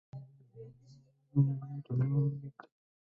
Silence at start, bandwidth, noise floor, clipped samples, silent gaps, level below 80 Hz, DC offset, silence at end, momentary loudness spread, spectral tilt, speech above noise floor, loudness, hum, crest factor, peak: 0.15 s; 2.3 kHz; -62 dBFS; under 0.1%; none; -72 dBFS; under 0.1%; 0.45 s; 23 LU; -12 dB/octave; 29 dB; -34 LUFS; none; 18 dB; -18 dBFS